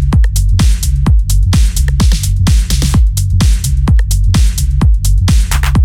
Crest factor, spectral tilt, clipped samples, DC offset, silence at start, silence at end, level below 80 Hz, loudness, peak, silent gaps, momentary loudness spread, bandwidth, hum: 8 dB; -5 dB/octave; under 0.1%; under 0.1%; 0 s; 0 s; -10 dBFS; -12 LUFS; 0 dBFS; none; 1 LU; 16 kHz; none